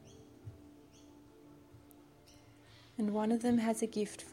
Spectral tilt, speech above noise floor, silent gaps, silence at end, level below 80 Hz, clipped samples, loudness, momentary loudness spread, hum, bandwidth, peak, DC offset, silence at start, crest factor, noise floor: -5.5 dB/octave; 27 dB; none; 0 s; -70 dBFS; under 0.1%; -35 LUFS; 26 LU; none; 15 kHz; -22 dBFS; under 0.1%; 0.05 s; 16 dB; -60 dBFS